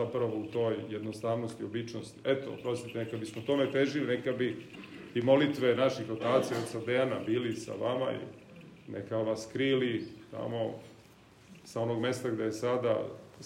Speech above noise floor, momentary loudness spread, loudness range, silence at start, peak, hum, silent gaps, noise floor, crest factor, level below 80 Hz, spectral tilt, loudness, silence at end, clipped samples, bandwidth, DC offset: 26 dB; 14 LU; 5 LU; 0 s; -12 dBFS; none; none; -58 dBFS; 20 dB; -74 dBFS; -6 dB/octave; -32 LUFS; 0 s; under 0.1%; 16 kHz; under 0.1%